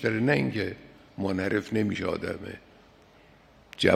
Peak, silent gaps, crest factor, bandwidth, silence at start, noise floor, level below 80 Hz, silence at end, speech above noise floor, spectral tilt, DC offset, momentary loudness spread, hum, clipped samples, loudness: -6 dBFS; none; 24 dB; 14.5 kHz; 0 s; -56 dBFS; -60 dBFS; 0 s; 28 dB; -6 dB/octave; under 0.1%; 21 LU; none; under 0.1%; -29 LUFS